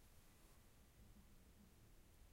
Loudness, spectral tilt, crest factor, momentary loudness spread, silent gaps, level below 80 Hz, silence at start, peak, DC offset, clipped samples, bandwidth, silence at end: -70 LUFS; -4.5 dB/octave; 12 dB; 1 LU; none; -70 dBFS; 0 s; -54 dBFS; under 0.1%; under 0.1%; 16 kHz; 0 s